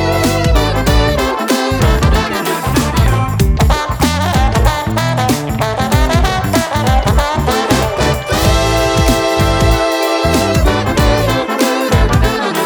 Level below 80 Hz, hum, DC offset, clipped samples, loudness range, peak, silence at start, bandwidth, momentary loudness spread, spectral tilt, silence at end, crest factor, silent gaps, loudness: -18 dBFS; none; under 0.1%; under 0.1%; 1 LU; 0 dBFS; 0 s; over 20 kHz; 3 LU; -5 dB/octave; 0 s; 12 dB; none; -13 LUFS